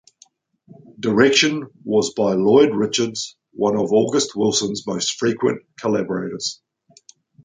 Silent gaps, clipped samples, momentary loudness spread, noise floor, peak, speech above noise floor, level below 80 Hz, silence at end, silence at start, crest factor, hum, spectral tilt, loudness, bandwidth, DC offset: none; under 0.1%; 12 LU; -55 dBFS; -2 dBFS; 37 dB; -60 dBFS; 0.9 s; 1 s; 18 dB; none; -4 dB/octave; -19 LUFS; 9.6 kHz; under 0.1%